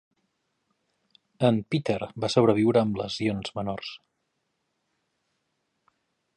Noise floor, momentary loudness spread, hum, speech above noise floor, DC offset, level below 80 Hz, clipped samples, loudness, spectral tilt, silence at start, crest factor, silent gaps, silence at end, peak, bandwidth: -78 dBFS; 11 LU; none; 53 dB; under 0.1%; -60 dBFS; under 0.1%; -26 LUFS; -6.5 dB/octave; 1.4 s; 22 dB; none; 2.4 s; -6 dBFS; 10 kHz